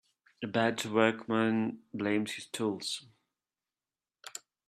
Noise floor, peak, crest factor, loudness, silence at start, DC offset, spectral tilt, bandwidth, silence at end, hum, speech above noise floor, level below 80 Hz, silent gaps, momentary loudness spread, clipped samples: under -90 dBFS; -10 dBFS; 24 dB; -32 LUFS; 0.4 s; under 0.1%; -4.5 dB/octave; 13.5 kHz; 0.3 s; none; over 59 dB; -76 dBFS; none; 17 LU; under 0.1%